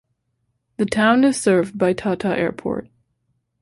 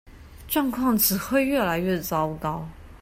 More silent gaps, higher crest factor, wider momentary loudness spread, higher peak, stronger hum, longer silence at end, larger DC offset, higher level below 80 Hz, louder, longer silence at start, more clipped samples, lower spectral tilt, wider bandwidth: neither; about the same, 16 dB vs 18 dB; about the same, 12 LU vs 10 LU; first, -4 dBFS vs -8 dBFS; neither; first, 0.8 s vs 0.05 s; neither; second, -54 dBFS vs -46 dBFS; first, -19 LUFS vs -24 LUFS; first, 0.8 s vs 0.05 s; neither; about the same, -5.5 dB/octave vs -4.5 dB/octave; second, 11.5 kHz vs 16.5 kHz